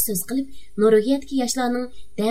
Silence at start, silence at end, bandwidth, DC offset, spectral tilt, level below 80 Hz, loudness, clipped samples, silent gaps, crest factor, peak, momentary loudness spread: 0 s; 0 s; 16 kHz; 2%; -4 dB/octave; -52 dBFS; -22 LUFS; under 0.1%; none; 16 dB; -6 dBFS; 11 LU